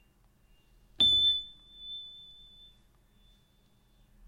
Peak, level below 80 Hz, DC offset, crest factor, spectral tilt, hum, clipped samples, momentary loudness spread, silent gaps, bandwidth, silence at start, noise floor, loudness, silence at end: -16 dBFS; -60 dBFS; under 0.1%; 20 dB; -2 dB/octave; none; under 0.1%; 26 LU; none; 15 kHz; 1 s; -66 dBFS; -24 LUFS; 2.15 s